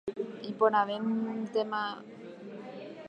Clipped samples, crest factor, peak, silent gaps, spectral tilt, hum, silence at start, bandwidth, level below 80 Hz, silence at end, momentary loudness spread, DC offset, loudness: under 0.1%; 20 dB; -12 dBFS; none; -6.5 dB/octave; none; 0.05 s; 7.8 kHz; -78 dBFS; 0 s; 18 LU; under 0.1%; -31 LUFS